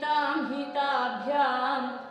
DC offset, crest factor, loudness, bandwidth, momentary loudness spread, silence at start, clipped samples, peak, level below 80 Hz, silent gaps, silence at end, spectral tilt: under 0.1%; 14 dB; -28 LUFS; 9.8 kHz; 5 LU; 0 s; under 0.1%; -14 dBFS; -80 dBFS; none; 0 s; -4.5 dB/octave